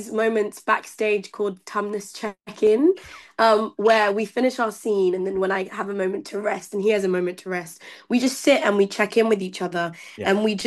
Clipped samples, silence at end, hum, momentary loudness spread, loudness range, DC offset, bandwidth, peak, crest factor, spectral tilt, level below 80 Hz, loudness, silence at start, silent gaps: under 0.1%; 0 s; none; 11 LU; 3 LU; under 0.1%; 12.5 kHz; -6 dBFS; 18 dB; -4.5 dB/octave; -66 dBFS; -22 LUFS; 0 s; none